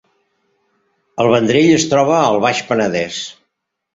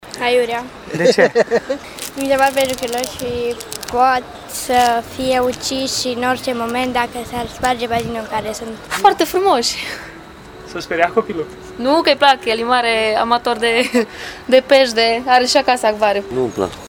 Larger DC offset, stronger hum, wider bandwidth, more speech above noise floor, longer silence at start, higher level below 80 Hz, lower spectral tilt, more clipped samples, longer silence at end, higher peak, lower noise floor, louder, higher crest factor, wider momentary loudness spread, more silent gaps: neither; neither; second, 8 kHz vs over 20 kHz; first, 59 dB vs 20 dB; first, 1.15 s vs 0.05 s; second, -54 dBFS vs -46 dBFS; first, -4.5 dB/octave vs -3 dB/octave; neither; first, 0.65 s vs 0 s; about the same, -2 dBFS vs 0 dBFS; first, -73 dBFS vs -36 dBFS; about the same, -14 LUFS vs -16 LUFS; about the same, 16 dB vs 16 dB; about the same, 13 LU vs 13 LU; neither